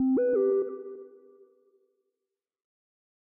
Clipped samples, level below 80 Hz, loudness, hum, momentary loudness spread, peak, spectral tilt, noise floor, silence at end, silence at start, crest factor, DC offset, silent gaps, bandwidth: under 0.1%; -78 dBFS; -27 LUFS; none; 20 LU; -18 dBFS; -10 dB/octave; -88 dBFS; 2.15 s; 0 s; 14 dB; under 0.1%; none; 2.6 kHz